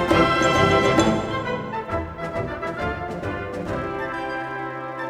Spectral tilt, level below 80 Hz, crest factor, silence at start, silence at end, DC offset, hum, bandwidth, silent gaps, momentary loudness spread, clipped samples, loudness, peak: -5.5 dB/octave; -42 dBFS; 20 dB; 0 s; 0 s; under 0.1%; none; 14.5 kHz; none; 12 LU; under 0.1%; -23 LUFS; -4 dBFS